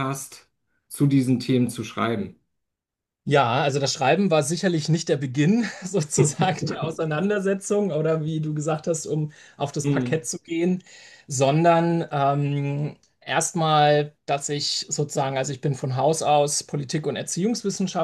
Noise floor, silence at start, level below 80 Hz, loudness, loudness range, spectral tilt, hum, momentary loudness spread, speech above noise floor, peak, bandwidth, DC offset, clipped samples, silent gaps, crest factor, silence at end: -86 dBFS; 0 s; -66 dBFS; -23 LUFS; 3 LU; -5 dB/octave; none; 9 LU; 63 dB; -4 dBFS; 12.5 kHz; under 0.1%; under 0.1%; none; 20 dB; 0 s